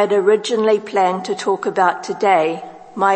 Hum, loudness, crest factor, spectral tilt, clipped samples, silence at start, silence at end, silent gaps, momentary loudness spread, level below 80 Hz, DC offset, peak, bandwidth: none; -17 LUFS; 16 dB; -4.5 dB/octave; under 0.1%; 0 s; 0 s; none; 6 LU; -72 dBFS; under 0.1%; -2 dBFS; 8.8 kHz